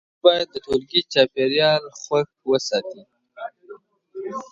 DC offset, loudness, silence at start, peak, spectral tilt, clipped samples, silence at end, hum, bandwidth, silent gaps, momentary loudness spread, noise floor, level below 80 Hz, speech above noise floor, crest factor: under 0.1%; -21 LUFS; 0.25 s; 0 dBFS; -4 dB/octave; under 0.1%; 0.05 s; none; 7.8 kHz; none; 19 LU; -45 dBFS; -60 dBFS; 25 dB; 22 dB